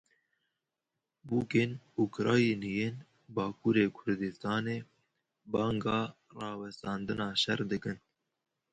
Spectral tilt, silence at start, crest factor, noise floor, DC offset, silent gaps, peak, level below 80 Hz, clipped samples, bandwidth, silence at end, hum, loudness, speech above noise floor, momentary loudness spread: -6 dB/octave; 1.25 s; 20 dB; -88 dBFS; under 0.1%; none; -14 dBFS; -66 dBFS; under 0.1%; 9.2 kHz; 0.75 s; none; -33 LUFS; 56 dB; 12 LU